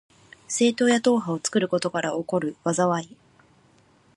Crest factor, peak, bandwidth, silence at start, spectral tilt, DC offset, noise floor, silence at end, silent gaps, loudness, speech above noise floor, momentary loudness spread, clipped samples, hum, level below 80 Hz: 18 dB; -8 dBFS; 11.5 kHz; 0.5 s; -4.5 dB/octave; under 0.1%; -59 dBFS; 1.1 s; none; -24 LUFS; 36 dB; 8 LU; under 0.1%; none; -70 dBFS